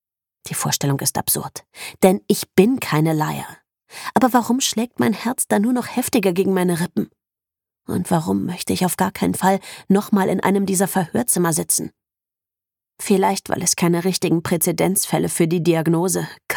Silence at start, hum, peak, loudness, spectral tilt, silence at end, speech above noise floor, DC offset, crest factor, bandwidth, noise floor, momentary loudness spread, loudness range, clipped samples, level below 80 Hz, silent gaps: 0.45 s; none; 0 dBFS; -19 LUFS; -4.5 dB/octave; 0 s; 70 dB; under 0.1%; 18 dB; 19 kHz; -89 dBFS; 8 LU; 3 LU; under 0.1%; -58 dBFS; none